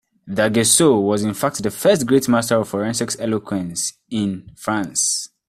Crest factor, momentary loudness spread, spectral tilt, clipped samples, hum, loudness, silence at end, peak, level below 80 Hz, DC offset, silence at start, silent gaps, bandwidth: 18 dB; 11 LU; -4 dB/octave; under 0.1%; none; -19 LUFS; 0.2 s; -2 dBFS; -56 dBFS; under 0.1%; 0.25 s; none; 16 kHz